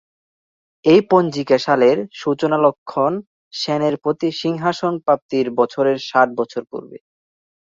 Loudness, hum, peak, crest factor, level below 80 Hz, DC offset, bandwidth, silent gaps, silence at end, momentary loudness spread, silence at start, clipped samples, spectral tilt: -18 LUFS; none; -2 dBFS; 16 dB; -64 dBFS; under 0.1%; 7.6 kHz; 2.78-2.86 s, 3.27-3.51 s, 5.22-5.29 s; 0.8 s; 11 LU; 0.85 s; under 0.1%; -6 dB/octave